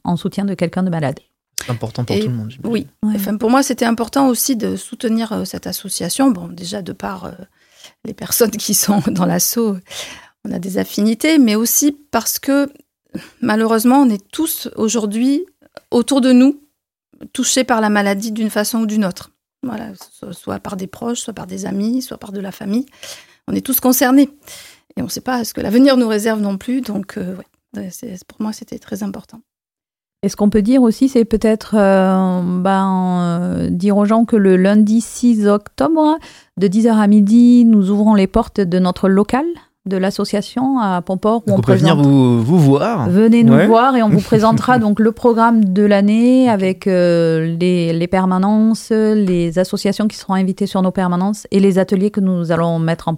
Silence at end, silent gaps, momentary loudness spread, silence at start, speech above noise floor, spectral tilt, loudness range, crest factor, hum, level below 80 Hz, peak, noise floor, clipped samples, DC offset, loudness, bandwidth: 0 s; none; 16 LU; 0.05 s; over 76 dB; -5.5 dB/octave; 10 LU; 14 dB; none; -46 dBFS; 0 dBFS; under -90 dBFS; under 0.1%; under 0.1%; -15 LUFS; 16.5 kHz